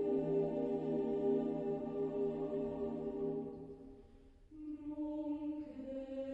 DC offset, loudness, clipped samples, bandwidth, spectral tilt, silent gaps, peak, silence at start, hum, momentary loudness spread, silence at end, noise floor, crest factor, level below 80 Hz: under 0.1%; -40 LUFS; under 0.1%; 4.5 kHz; -10 dB/octave; none; -24 dBFS; 0 s; none; 15 LU; 0 s; -61 dBFS; 14 dB; -64 dBFS